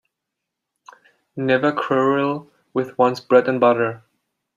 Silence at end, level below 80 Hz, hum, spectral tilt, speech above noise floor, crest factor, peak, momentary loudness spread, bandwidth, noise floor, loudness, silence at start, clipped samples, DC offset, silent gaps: 0.6 s; -68 dBFS; none; -7 dB/octave; 63 dB; 18 dB; -2 dBFS; 12 LU; 7.4 kHz; -81 dBFS; -19 LUFS; 1.35 s; under 0.1%; under 0.1%; none